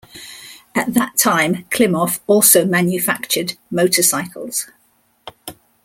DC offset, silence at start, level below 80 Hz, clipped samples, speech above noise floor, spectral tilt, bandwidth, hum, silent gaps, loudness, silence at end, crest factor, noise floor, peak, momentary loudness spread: under 0.1%; 0.15 s; -58 dBFS; under 0.1%; 43 dB; -3 dB/octave; 17 kHz; none; none; -16 LUFS; 0.35 s; 18 dB; -59 dBFS; 0 dBFS; 23 LU